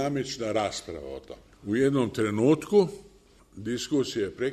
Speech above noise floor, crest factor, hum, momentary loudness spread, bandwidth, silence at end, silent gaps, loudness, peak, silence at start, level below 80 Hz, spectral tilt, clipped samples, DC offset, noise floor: 27 dB; 18 dB; none; 17 LU; 13.5 kHz; 0 s; none; -27 LUFS; -10 dBFS; 0 s; -58 dBFS; -5.5 dB/octave; under 0.1%; under 0.1%; -54 dBFS